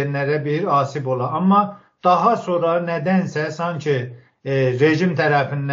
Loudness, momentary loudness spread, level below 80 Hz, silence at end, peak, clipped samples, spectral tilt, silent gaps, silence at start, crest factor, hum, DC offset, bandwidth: -19 LUFS; 8 LU; -66 dBFS; 0 s; -2 dBFS; under 0.1%; -6 dB/octave; none; 0 s; 16 dB; none; under 0.1%; 7.6 kHz